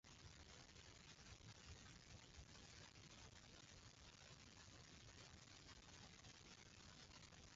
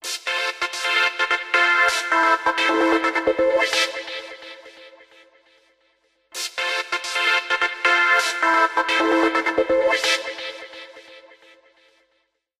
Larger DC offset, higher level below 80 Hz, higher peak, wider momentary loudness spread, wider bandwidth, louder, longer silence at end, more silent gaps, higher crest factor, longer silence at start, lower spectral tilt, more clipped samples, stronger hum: neither; second, -72 dBFS vs -60 dBFS; second, -48 dBFS vs -6 dBFS; second, 1 LU vs 15 LU; second, 8.8 kHz vs 15 kHz; second, -63 LUFS vs -19 LUFS; second, 0 s vs 1.4 s; neither; about the same, 16 dB vs 16 dB; about the same, 0.05 s vs 0.05 s; first, -3 dB/octave vs -0.5 dB/octave; neither; neither